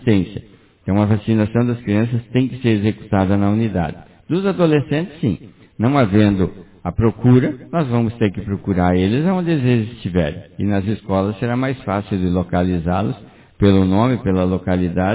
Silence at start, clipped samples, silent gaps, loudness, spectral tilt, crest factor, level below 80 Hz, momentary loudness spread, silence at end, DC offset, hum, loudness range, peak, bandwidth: 0 s; under 0.1%; none; -18 LUFS; -12 dB/octave; 16 dB; -36 dBFS; 8 LU; 0 s; under 0.1%; none; 2 LU; 0 dBFS; 4 kHz